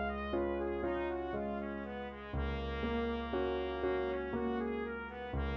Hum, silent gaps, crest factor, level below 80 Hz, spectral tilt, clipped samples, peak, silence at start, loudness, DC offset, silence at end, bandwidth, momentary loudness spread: none; none; 14 dB; -46 dBFS; -8.5 dB/octave; under 0.1%; -22 dBFS; 0 s; -38 LUFS; under 0.1%; 0 s; 6.2 kHz; 6 LU